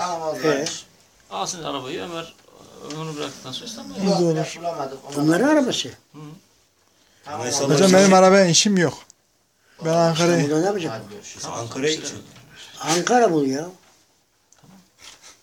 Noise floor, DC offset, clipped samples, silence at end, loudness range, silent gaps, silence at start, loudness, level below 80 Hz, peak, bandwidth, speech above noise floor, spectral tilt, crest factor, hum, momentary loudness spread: -64 dBFS; under 0.1%; under 0.1%; 0.15 s; 10 LU; none; 0 s; -20 LUFS; -66 dBFS; -2 dBFS; 16.5 kHz; 44 dB; -4 dB/octave; 20 dB; none; 21 LU